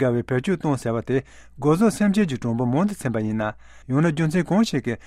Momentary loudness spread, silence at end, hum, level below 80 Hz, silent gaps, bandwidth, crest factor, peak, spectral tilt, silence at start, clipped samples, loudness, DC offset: 7 LU; 0.05 s; none; -50 dBFS; none; 14 kHz; 14 dB; -8 dBFS; -7 dB/octave; 0 s; under 0.1%; -22 LUFS; under 0.1%